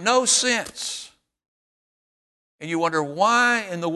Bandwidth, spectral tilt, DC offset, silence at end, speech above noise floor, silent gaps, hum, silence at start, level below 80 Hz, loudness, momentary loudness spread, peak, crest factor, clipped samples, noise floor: 12.5 kHz; -2 dB/octave; under 0.1%; 0 s; over 69 dB; 1.48-2.58 s; none; 0 s; -68 dBFS; -21 LUFS; 13 LU; -6 dBFS; 18 dB; under 0.1%; under -90 dBFS